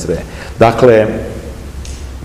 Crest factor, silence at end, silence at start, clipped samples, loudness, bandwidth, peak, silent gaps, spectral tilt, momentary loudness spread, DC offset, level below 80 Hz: 14 dB; 0 s; 0 s; 1%; -11 LUFS; 15.5 kHz; 0 dBFS; none; -6.5 dB/octave; 19 LU; under 0.1%; -28 dBFS